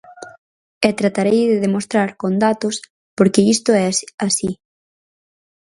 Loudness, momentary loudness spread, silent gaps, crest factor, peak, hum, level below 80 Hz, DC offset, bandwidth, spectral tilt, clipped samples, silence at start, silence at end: -17 LUFS; 9 LU; 0.38-0.81 s, 2.90-3.17 s, 4.14-4.18 s; 18 dB; 0 dBFS; none; -58 dBFS; under 0.1%; 11.5 kHz; -4.5 dB/octave; under 0.1%; 0.1 s; 1.2 s